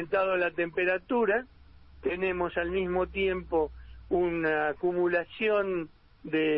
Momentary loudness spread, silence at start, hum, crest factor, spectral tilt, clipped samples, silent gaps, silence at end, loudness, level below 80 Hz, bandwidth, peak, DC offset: 6 LU; 0 s; none; 12 dB; -9.5 dB/octave; under 0.1%; none; 0 s; -29 LUFS; -52 dBFS; 5.2 kHz; -16 dBFS; under 0.1%